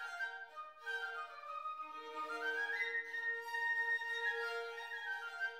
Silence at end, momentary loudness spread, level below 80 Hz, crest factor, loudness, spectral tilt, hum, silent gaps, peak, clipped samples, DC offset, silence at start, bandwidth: 0 s; 11 LU; under -90 dBFS; 14 dB; -40 LUFS; 0.5 dB/octave; none; none; -28 dBFS; under 0.1%; under 0.1%; 0 s; 16 kHz